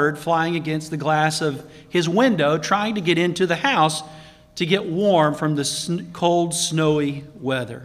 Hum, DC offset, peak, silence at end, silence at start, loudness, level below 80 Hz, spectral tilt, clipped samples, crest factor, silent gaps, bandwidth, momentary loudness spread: none; under 0.1%; -4 dBFS; 0 s; 0 s; -21 LUFS; -58 dBFS; -4.5 dB/octave; under 0.1%; 18 dB; none; 15.5 kHz; 9 LU